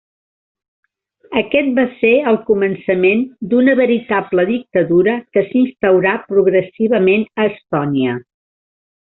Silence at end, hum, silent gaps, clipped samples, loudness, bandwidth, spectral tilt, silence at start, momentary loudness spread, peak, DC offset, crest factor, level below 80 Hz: 0.8 s; none; none; under 0.1%; -15 LUFS; 4.1 kHz; -5 dB/octave; 1.3 s; 6 LU; 0 dBFS; under 0.1%; 14 dB; -56 dBFS